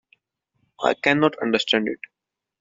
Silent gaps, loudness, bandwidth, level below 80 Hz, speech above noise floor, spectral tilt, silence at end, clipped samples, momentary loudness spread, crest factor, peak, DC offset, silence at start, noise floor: none; -21 LUFS; 7.8 kHz; -64 dBFS; 51 dB; -2 dB/octave; 0.65 s; under 0.1%; 14 LU; 22 dB; -2 dBFS; under 0.1%; 0.8 s; -72 dBFS